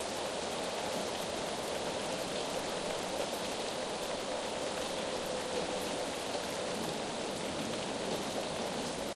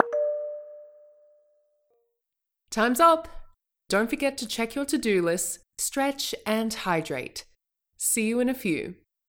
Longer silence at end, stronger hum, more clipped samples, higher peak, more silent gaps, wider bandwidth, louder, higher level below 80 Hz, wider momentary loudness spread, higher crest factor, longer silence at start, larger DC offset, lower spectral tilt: second, 0 s vs 0.35 s; neither; neither; second, -22 dBFS vs -2 dBFS; neither; second, 14 kHz vs 17.5 kHz; second, -36 LUFS vs -26 LUFS; second, -62 dBFS vs -56 dBFS; second, 1 LU vs 14 LU; second, 14 dB vs 26 dB; about the same, 0 s vs 0 s; neither; about the same, -3 dB/octave vs -3 dB/octave